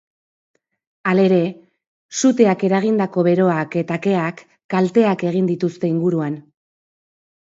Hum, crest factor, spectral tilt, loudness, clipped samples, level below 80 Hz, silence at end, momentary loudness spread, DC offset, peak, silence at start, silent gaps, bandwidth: none; 18 dB; -6.5 dB/octave; -18 LUFS; under 0.1%; -66 dBFS; 1.15 s; 10 LU; under 0.1%; -2 dBFS; 1.05 s; 1.87-2.09 s, 4.64-4.69 s; 8 kHz